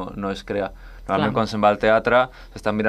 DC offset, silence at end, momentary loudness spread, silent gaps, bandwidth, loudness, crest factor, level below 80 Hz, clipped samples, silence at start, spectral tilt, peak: under 0.1%; 0 s; 12 LU; none; 12.5 kHz; -21 LUFS; 18 dB; -44 dBFS; under 0.1%; 0 s; -6.5 dB/octave; -4 dBFS